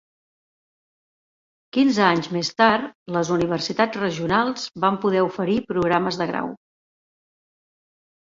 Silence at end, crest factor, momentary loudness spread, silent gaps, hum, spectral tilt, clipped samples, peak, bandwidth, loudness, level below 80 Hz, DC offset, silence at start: 1.7 s; 20 dB; 8 LU; 2.95-3.06 s; none; -5.5 dB/octave; under 0.1%; -4 dBFS; 7.8 kHz; -21 LUFS; -58 dBFS; under 0.1%; 1.75 s